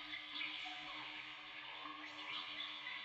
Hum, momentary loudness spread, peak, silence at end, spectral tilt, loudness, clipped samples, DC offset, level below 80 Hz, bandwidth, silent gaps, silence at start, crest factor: none; 5 LU; -32 dBFS; 0 s; -1.5 dB/octave; -46 LUFS; under 0.1%; under 0.1%; -84 dBFS; 12 kHz; none; 0 s; 16 dB